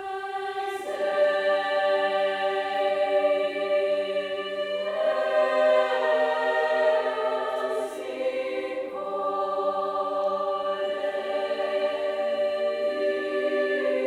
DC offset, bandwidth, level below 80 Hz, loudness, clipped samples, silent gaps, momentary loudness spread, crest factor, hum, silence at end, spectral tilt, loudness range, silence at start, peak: under 0.1%; 11.5 kHz; -72 dBFS; -26 LUFS; under 0.1%; none; 7 LU; 14 dB; none; 0 s; -3.5 dB/octave; 4 LU; 0 s; -10 dBFS